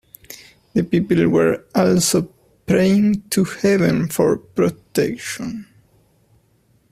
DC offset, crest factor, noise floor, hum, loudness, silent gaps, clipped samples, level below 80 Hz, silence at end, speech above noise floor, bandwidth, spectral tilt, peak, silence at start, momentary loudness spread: under 0.1%; 18 dB; -59 dBFS; none; -18 LUFS; none; under 0.1%; -52 dBFS; 1.3 s; 42 dB; 15.5 kHz; -5.5 dB/octave; -2 dBFS; 0.3 s; 18 LU